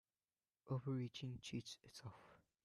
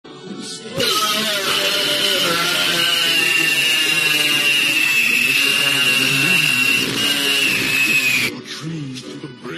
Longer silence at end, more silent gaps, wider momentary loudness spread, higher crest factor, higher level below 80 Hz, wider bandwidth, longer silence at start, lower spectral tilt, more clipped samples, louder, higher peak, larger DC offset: first, 0.3 s vs 0 s; neither; about the same, 16 LU vs 15 LU; about the same, 16 dB vs 14 dB; second, -78 dBFS vs -60 dBFS; second, 12.5 kHz vs 15.5 kHz; first, 0.65 s vs 0.05 s; first, -6 dB/octave vs -1 dB/octave; neither; second, -49 LUFS vs -14 LUFS; second, -34 dBFS vs -4 dBFS; neither